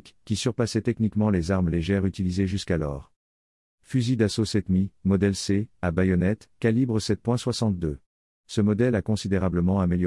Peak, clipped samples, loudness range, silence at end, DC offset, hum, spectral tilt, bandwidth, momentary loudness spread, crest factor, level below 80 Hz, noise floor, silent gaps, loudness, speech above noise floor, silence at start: -10 dBFS; under 0.1%; 2 LU; 0 s; under 0.1%; none; -6.5 dB/octave; 12 kHz; 5 LU; 16 dB; -48 dBFS; under -90 dBFS; 3.16-3.78 s, 8.06-8.44 s; -25 LUFS; over 66 dB; 0.05 s